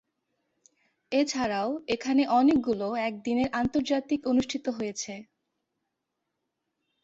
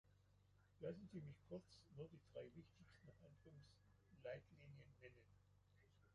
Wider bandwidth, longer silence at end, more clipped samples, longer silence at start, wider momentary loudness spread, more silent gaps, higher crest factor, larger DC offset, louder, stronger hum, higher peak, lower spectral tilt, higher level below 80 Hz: second, 8 kHz vs 10.5 kHz; first, 1.8 s vs 0 s; neither; first, 1.1 s vs 0.05 s; second, 10 LU vs 13 LU; neither; second, 16 dB vs 22 dB; neither; first, -27 LUFS vs -60 LUFS; neither; first, -12 dBFS vs -40 dBFS; second, -4.5 dB/octave vs -7 dB/octave; first, -60 dBFS vs -80 dBFS